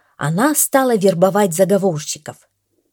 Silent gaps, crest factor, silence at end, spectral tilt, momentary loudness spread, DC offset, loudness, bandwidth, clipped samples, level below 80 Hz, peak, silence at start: none; 16 dB; 0.6 s; -4.5 dB/octave; 12 LU; under 0.1%; -16 LUFS; 19.5 kHz; under 0.1%; -66 dBFS; 0 dBFS; 0.2 s